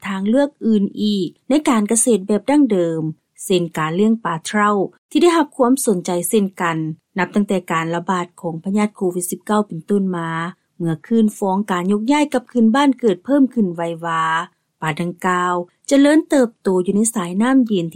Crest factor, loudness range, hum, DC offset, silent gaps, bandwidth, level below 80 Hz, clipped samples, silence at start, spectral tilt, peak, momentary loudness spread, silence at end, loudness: 14 dB; 3 LU; none; under 0.1%; 4.98-5.09 s; 16 kHz; -62 dBFS; under 0.1%; 0 s; -5 dB/octave; -4 dBFS; 9 LU; 0.05 s; -18 LUFS